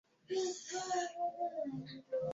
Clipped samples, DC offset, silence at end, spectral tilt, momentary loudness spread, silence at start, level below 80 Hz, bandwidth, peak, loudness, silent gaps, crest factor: under 0.1%; under 0.1%; 0 s; -3.5 dB/octave; 5 LU; 0.3 s; -80 dBFS; 7.6 kHz; -26 dBFS; -40 LUFS; none; 14 dB